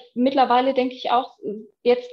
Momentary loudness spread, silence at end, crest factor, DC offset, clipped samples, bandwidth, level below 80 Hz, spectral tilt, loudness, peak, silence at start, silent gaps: 15 LU; 0 s; 16 dB; under 0.1%; under 0.1%; 6.4 kHz; -70 dBFS; -6 dB/octave; -21 LUFS; -6 dBFS; 0.15 s; none